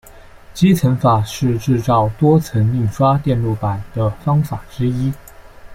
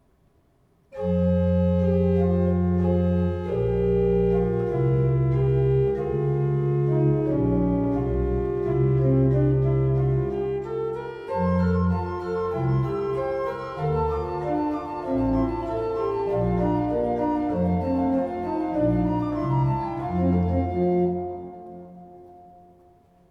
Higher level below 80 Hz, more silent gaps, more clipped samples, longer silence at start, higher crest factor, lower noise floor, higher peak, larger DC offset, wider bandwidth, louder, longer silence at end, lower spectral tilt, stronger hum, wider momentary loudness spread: about the same, -38 dBFS vs -38 dBFS; neither; neither; second, 0.05 s vs 0.95 s; about the same, 14 dB vs 12 dB; second, -40 dBFS vs -62 dBFS; first, -2 dBFS vs -10 dBFS; neither; first, 16.5 kHz vs 5.6 kHz; first, -17 LUFS vs -24 LUFS; second, 0 s vs 0.9 s; second, -7.5 dB/octave vs -11 dB/octave; neither; about the same, 8 LU vs 7 LU